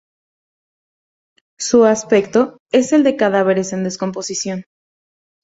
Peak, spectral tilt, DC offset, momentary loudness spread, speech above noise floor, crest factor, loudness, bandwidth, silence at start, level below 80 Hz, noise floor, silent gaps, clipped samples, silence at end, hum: -2 dBFS; -4.5 dB/octave; under 0.1%; 10 LU; over 75 dB; 16 dB; -16 LUFS; 8 kHz; 1.6 s; -60 dBFS; under -90 dBFS; 2.60-2.66 s; under 0.1%; 0.8 s; none